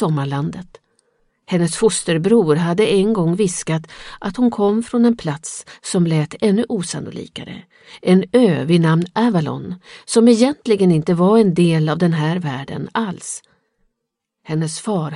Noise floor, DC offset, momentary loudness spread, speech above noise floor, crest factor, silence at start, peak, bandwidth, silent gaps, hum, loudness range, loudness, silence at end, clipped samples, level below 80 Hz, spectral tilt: -78 dBFS; under 0.1%; 15 LU; 61 dB; 16 dB; 0 s; 0 dBFS; 11.5 kHz; none; none; 5 LU; -17 LUFS; 0 s; under 0.1%; -54 dBFS; -6 dB/octave